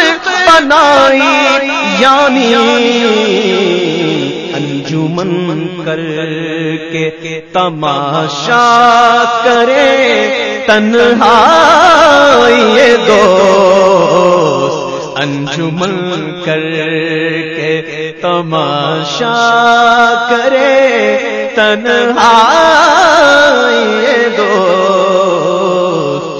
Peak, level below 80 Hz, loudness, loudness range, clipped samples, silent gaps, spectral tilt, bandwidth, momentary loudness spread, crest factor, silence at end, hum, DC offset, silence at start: 0 dBFS; -46 dBFS; -8 LUFS; 9 LU; 1%; none; -4 dB/octave; 11 kHz; 11 LU; 8 dB; 0 s; none; under 0.1%; 0 s